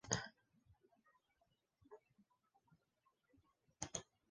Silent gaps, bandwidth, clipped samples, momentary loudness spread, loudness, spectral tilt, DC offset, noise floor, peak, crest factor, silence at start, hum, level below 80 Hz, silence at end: none; 9 kHz; under 0.1%; 22 LU; -48 LUFS; -2.5 dB/octave; under 0.1%; -84 dBFS; -20 dBFS; 34 dB; 0.05 s; none; -74 dBFS; 0.25 s